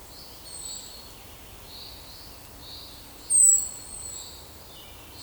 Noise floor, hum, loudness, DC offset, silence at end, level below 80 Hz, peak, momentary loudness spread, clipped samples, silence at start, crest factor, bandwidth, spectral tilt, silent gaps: -45 dBFS; none; -21 LUFS; under 0.1%; 0 s; -54 dBFS; -8 dBFS; 26 LU; under 0.1%; 0 s; 22 dB; over 20 kHz; 0 dB/octave; none